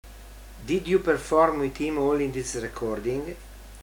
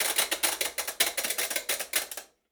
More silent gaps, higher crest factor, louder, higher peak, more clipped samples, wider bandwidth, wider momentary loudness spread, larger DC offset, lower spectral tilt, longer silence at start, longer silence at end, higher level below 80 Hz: neither; about the same, 18 dB vs 22 dB; about the same, -26 LUFS vs -27 LUFS; about the same, -8 dBFS vs -8 dBFS; neither; about the same, over 20 kHz vs over 20 kHz; first, 21 LU vs 5 LU; neither; first, -5.5 dB/octave vs 2 dB/octave; about the same, 0.05 s vs 0 s; second, 0 s vs 0.25 s; first, -44 dBFS vs -66 dBFS